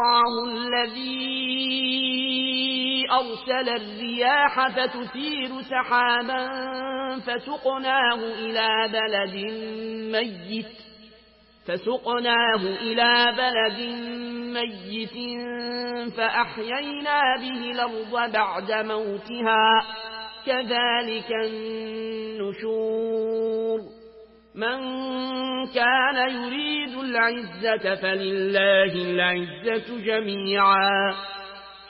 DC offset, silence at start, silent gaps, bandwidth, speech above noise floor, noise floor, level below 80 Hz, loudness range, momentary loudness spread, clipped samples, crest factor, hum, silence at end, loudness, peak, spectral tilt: under 0.1%; 0 s; none; 5.8 kHz; 31 dB; -55 dBFS; -66 dBFS; 5 LU; 12 LU; under 0.1%; 16 dB; none; 0 s; -24 LUFS; -8 dBFS; -8 dB/octave